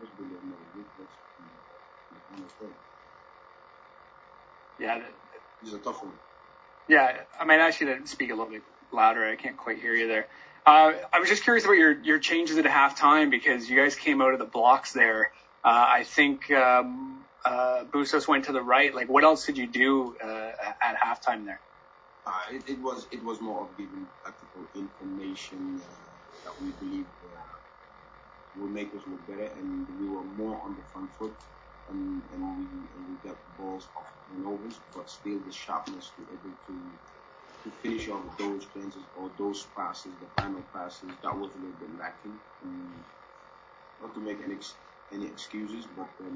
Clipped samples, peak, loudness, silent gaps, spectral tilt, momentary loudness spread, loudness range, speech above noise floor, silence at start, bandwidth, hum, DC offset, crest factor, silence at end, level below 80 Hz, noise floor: under 0.1%; -2 dBFS; -25 LUFS; none; -3.5 dB/octave; 24 LU; 20 LU; 29 dB; 0 s; 8 kHz; none; under 0.1%; 26 dB; 0 s; -64 dBFS; -56 dBFS